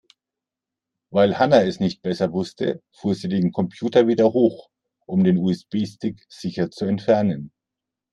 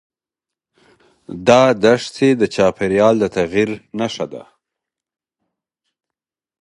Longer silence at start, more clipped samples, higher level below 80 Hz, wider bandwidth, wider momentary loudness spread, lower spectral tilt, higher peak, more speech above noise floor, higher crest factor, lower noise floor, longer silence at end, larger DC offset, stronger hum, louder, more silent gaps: second, 1.1 s vs 1.3 s; neither; second, -62 dBFS vs -52 dBFS; second, 9.6 kHz vs 11.5 kHz; second, 11 LU vs 14 LU; first, -7.5 dB/octave vs -5.5 dB/octave; about the same, -2 dBFS vs 0 dBFS; second, 67 dB vs 71 dB; about the same, 20 dB vs 18 dB; about the same, -87 dBFS vs -87 dBFS; second, 0.65 s vs 2.2 s; neither; neither; second, -21 LUFS vs -16 LUFS; neither